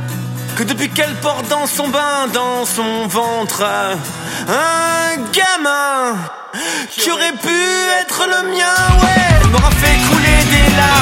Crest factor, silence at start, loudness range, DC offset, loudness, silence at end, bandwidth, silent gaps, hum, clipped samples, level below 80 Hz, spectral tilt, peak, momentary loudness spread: 14 dB; 0 s; 5 LU; under 0.1%; -14 LUFS; 0 s; 16.5 kHz; none; none; under 0.1%; -22 dBFS; -3.5 dB/octave; 0 dBFS; 10 LU